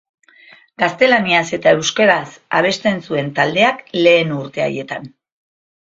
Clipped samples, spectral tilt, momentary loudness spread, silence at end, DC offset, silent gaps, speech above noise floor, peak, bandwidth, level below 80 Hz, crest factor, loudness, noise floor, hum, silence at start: under 0.1%; -4 dB/octave; 9 LU; 0.9 s; under 0.1%; none; 31 dB; 0 dBFS; 7.8 kHz; -60 dBFS; 16 dB; -15 LUFS; -46 dBFS; none; 0.8 s